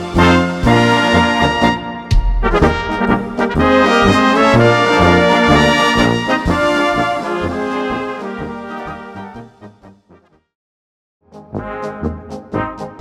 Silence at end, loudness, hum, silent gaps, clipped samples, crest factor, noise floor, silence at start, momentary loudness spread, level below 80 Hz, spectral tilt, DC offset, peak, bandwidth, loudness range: 0 s; -13 LUFS; none; 10.55-11.20 s; under 0.1%; 14 dB; -49 dBFS; 0 s; 16 LU; -26 dBFS; -5.5 dB/octave; under 0.1%; 0 dBFS; 14.5 kHz; 19 LU